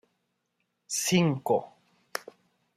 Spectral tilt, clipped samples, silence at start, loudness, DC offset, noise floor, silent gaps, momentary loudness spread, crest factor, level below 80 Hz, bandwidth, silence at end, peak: -4.5 dB/octave; under 0.1%; 0.9 s; -28 LUFS; under 0.1%; -79 dBFS; none; 15 LU; 20 dB; -72 dBFS; 16 kHz; 0.55 s; -10 dBFS